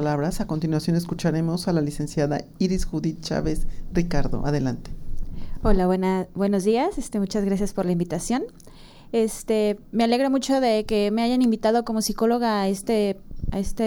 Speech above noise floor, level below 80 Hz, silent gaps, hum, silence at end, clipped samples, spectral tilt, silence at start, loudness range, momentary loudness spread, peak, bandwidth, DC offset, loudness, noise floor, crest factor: 22 dB; -34 dBFS; none; none; 0 s; under 0.1%; -6 dB/octave; 0 s; 4 LU; 8 LU; -6 dBFS; 18 kHz; under 0.1%; -24 LUFS; -45 dBFS; 18 dB